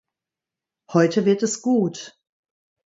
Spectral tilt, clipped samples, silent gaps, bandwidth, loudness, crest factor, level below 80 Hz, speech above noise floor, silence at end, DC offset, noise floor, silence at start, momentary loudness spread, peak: -5.5 dB/octave; under 0.1%; none; 8 kHz; -21 LUFS; 20 dB; -70 dBFS; 68 dB; 0.8 s; under 0.1%; -88 dBFS; 0.9 s; 15 LU; -4 dBFS